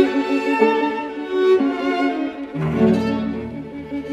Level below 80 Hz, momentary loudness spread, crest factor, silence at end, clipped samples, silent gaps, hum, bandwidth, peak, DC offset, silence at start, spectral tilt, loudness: -48 dBFS; 12 LU; 18 dB; 0 s; under 0.1%; none; none; 9.4 kHz; -2 dBFS; under 0.1%; 0 s; -7.5 dB/octave; -20 LUFS